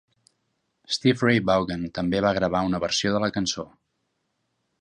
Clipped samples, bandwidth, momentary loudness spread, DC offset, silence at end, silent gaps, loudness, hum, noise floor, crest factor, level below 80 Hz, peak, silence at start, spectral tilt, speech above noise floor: under 0.1%; 10.5 kHz; 9 LU; under 0.1%; 1.15 s; none; -24 LUFS; none; -75 dBFS; 20 dB; -52 dBFS; -6 dBFS; 0.9 s; -5 dB/octave; 52 dB